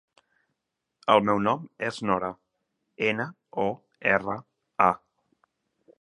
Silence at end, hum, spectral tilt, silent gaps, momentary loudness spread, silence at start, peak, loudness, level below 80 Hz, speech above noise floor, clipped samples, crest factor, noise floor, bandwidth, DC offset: 1.05 s; none; -6 dB/octave; none; 13 LU; 1.05 s; -4 dBFS; -26 LUFS; -64 dBFS; 58 dB; under 0.1%; 24 dB; -83 dBFS; 11 kHz; under 0.1%